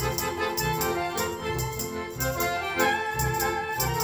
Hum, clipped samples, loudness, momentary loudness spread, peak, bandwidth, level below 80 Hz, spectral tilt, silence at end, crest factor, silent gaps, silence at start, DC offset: none; under 0.1%; -27 LUFS; 5 LU; -10 dBFS; over 20 kHz; -42 dBFS; -3.5 dB/octave; 0 s; 16 dB; none; 0 s; under 0.1%